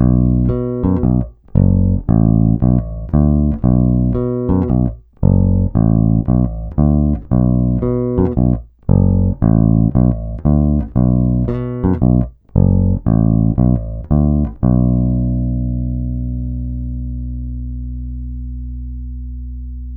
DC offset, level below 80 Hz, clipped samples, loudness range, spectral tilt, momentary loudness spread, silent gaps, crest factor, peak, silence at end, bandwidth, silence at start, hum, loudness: under 0.1%; -22 dBFS; under 0.1%; 7 LU; -15 dB/octave; 13 LU; none; 14 dB; 0 dBFS; 0 s; 2.2 kHz; 0 s; 60 Hz at -35 dBFS; -15 LUFS